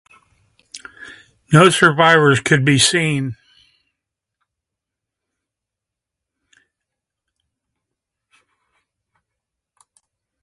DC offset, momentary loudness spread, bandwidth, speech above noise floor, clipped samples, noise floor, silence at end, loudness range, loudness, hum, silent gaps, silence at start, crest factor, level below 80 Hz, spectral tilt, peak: under 0.1%; 25 LU; 11.5 kHz; 71 dB; under 0.1%; -84 dBFS; 7.1 s; 11 LU; -13 LUFS; none; none; 0.75 s; 20 dB; -56 dBFS; -4.5 dB/octave; 0 dBFS